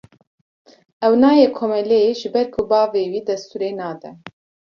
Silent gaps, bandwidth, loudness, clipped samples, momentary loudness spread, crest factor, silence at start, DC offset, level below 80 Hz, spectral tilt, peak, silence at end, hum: none; 7 kHz; -18 LUFS; under 0.1%; 15 LU; 16 dB; 1 s; under 0.1%; -58 dBFS; -6 dB/octave; -2 dBFS; 0.5 s; none